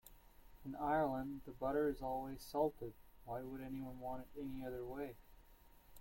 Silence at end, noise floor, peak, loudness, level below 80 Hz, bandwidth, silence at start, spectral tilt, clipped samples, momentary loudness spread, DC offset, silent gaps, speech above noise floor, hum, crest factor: 0 s; -64 dBFS; -26 dBFS; -43 LUFS; -60 dBFS; 16.5 kHz; 0.05 s; -7 dB/octave; under 0.1%; 15 LU; under 0.1%; none; 22 dB; none; 18 dB